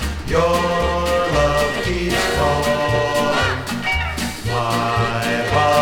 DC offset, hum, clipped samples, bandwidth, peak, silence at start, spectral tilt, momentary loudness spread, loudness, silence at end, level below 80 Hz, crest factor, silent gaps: under 0.1%; none; under 0.1%; 19.5 kHz; -4 dBFS; 0 s; -4.5 dB/octave; 4 LU; -18 LUFS; 0 s; -30 dBFS; 14 dB; none